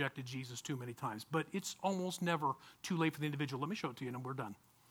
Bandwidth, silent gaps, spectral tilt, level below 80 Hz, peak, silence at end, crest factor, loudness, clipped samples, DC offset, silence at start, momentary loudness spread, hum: 20 kHz; none; -5 dB/octave; -80 dBFS; -20 dBFS; 0.35 s; 20 dB; -40 LUFS; under 0.1%; under 0.1%; 0 s; 9 LU; none